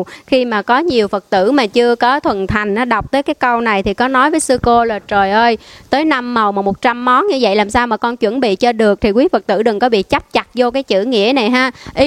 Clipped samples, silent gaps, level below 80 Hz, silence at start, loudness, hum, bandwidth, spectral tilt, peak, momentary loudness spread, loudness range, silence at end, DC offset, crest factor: under 0.1%; none; -38 dBFS; 0 s; -14 LUFS; none; 13.5 kHz; -4.5 dB/octave; 0 dBFS; 4 LU; 1 LU; 0 s; under 0.1%; 14 dB